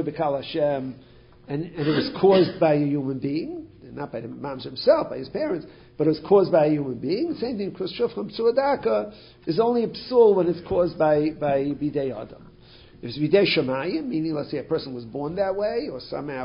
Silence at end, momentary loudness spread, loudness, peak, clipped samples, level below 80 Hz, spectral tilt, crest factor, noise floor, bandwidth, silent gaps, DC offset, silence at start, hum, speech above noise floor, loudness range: 0 s; 15 LU; -24 LUFS; -6 dBFS; under 0.1%; -56 dBFS; -11 dB/octave; 18 dB; -49 dBFS; 5.4 kHz; none; under 0.1%; 0 s; none; 26 dB; 3 LU